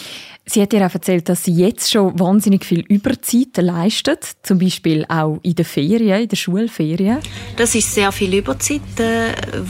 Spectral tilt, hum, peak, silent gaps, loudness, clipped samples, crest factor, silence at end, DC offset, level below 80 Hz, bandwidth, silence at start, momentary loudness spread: -5 dB/octave; none; -4 dBFS; none; -16 LUFS; under 0.1%; 12 dB; 0 s; under 0.1%; -42 dBFS; 16.5 kHz; 0 s; 5 LU